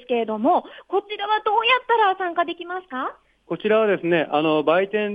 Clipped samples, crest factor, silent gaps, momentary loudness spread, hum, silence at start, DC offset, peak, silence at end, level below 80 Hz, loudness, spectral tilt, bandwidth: under 0.1%; 16 dB; none; 11 LU; none; 0.1 s; under 0.1%; -6 dBFS; 0 s; -68 dBFS; -21 LUFS; -7 dB/octave; 5 kHz